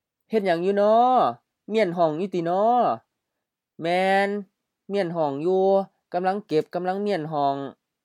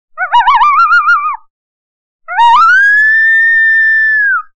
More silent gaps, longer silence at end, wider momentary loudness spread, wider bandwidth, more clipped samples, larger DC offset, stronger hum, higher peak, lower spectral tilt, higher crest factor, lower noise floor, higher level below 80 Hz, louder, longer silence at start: second, none vs 1.50-2.19 s; first, 0.3 s vs 0.15 s; first, 11 LU vs 7 LU; first, 12 kHz vs 9 kHz; neither; second, under 0.1% vs 2%; neither; second, -8 dBFS vs 0 dBFS; first, -7 dB/octave vs 1 dB/octave; first, 16 dB vs 8 dB; second, -84 dBFS vs under -90 dBFS; second, -84 dBFS vs -46 dBFS; second, -23 LUFS vs -6 LUFS; first, 0.3 s vs 0.15 s